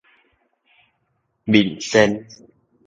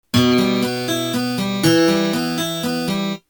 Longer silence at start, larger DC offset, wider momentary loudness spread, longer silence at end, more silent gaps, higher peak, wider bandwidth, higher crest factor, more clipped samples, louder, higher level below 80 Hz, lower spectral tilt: first, 1.45 s vs 0.15 s; neither; first, 14 LU vs 6 LU; first, 0.65 s vs 0.1 s; neither; about the same, 0 dBFS vs -2 dBFS; second, 8.8 kHz vs over 20 kHz; first, 22 dB vs 16 dB; neither; about the same, -18 LUFS vs -18 LUFS; about the same, -56 dBFS vs -52 dBFS; about the same, -5 dB/octave vs -4.5 dB/octave